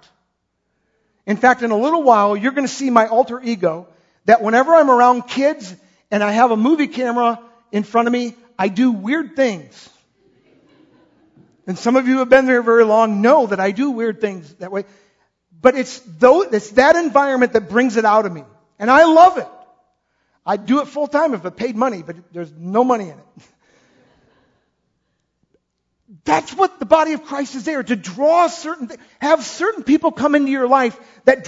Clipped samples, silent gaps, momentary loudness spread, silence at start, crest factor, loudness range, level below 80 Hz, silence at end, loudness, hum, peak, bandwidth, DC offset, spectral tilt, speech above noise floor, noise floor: under 0.1%; none; 15 LU; 1.25 s; 16 dB; 8 LU; -60 dBFS; 0 s; -16 LUFS; none; 0 dBFS; 8 kHz; under 0.1%; -5 dB/octave; 55 dB; -71 dBFS